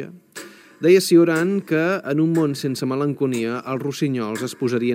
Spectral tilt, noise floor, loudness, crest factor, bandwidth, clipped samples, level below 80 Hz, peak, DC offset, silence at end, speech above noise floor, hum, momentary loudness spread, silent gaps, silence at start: -6 dB/octave; -40 dBFS; -20 LUFS; 16 dB; 16 kHz; under 0.1%; -74 dBFS; -4 dBFS; under 0.1%; 0 s; 21 dB; none; 11 LU; none; 0 s